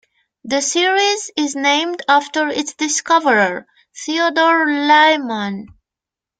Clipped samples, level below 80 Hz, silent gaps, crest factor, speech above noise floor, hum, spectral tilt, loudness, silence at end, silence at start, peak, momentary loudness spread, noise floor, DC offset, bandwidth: under 0.1%; -64 dBFS; none; 16 dB; 71 dB; none; -2 dB/octave; -15 LUFS; 0.75 s; 0.45 s; 0 dBFS; 11 LU; -87 dBFS; under 0.1%; 9.6 kHz